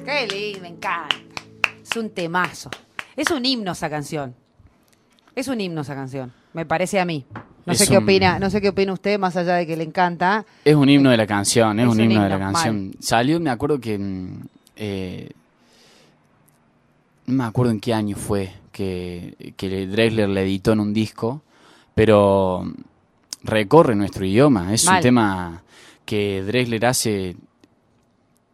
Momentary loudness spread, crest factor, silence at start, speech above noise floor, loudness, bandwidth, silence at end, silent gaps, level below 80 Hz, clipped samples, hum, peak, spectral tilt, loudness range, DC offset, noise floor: 18 LU; 20 dB; 0 s; 42 dB; -20 LUFS; 15 kHz; 1.2 s; none; -50 dBFS; under 0.1%; none; 0 dBFS; -5 dB/octave; 9 LU; under 0.1%; -62 dBFS